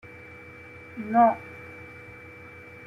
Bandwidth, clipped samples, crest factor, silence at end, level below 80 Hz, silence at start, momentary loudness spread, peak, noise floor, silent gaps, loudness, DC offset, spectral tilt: 5.8 kHz; under 0.1%; 20 dB; 0.95 s; -66 dBFS; 0.95 s; 23 LU; -8 dBFS; -45 dBFS; none; -24 LUFS; under 0.1%; -8 dB/octave